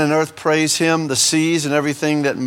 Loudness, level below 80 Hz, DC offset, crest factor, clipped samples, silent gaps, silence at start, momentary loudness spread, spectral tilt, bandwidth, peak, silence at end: -17 LUFS; -62 dBFS; under 0.1%; 16 dB; under 0.1%; none; 0 s; 4 LU; -3.5 dB/octave; 18 kHz; -2 dBFS; 0 s